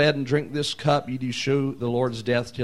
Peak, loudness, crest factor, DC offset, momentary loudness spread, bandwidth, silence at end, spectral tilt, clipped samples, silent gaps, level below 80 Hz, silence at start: -6 dBFS; -25 LUFS; 18 dB; 0.4%; 4 LU; 12.5 kHz; 0 s; -5.5 dB/octave; under 0.1%; none; -56 dBFS; 0 s